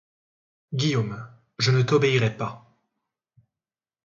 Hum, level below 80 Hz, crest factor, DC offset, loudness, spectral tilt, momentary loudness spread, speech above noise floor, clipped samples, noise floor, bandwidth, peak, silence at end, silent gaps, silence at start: none; -62 dBFS; 18 dB; under 0.1%; -24 LUFS; -5.5 dB/octave; 14 LU; over 68 dB; under 0.1%; under -90 dBFS; 7.6 kHz; -8 dBFS; 1.45 s; none; 0.7 s